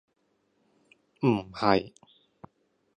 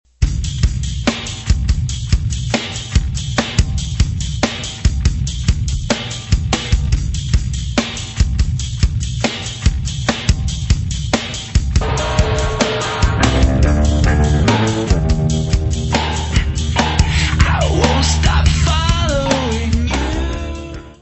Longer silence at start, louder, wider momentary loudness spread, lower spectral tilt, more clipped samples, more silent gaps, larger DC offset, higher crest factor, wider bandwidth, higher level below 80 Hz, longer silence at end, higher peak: first, 1.2 s vs 0.2 s; second, -27 LUFS vs -17 LUFS; about the same, 5 LU vs 6 LU; first, -7.5 dB/octave vs -5 dB/octave; neither; neither; neither; first, 26 dB vs 16 dB; first, 10 kHz vs 8.4 kHz; second, -62 dBFS vs -20 dBFS; first, 1.1 s vs 0.05 s; second, -6 dBFS vs 0 dBFS